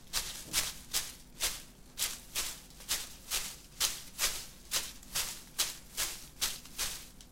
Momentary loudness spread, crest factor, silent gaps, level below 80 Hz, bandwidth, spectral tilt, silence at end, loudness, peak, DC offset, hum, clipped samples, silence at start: 7 LU; 26 dB; none; -54 dBFS; 16.5 kHz; 0.5 dB/octave; 0 s; -35 LUFS; -12 dBFS; under 0.1%; none; under 0.1%; 0 s